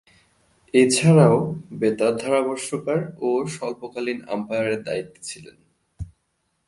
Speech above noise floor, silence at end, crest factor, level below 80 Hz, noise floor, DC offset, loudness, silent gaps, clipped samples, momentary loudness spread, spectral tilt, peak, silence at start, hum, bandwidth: 51 dB; 0.6 s; 20 dB; -52 dBFS; -72 dBFS; under 0.1%; -21 LUFS; none; under 0.1%; 20 LU; -5.5 dB/octave; -2 dBFS; 0.75 s; none; 11.5 kHz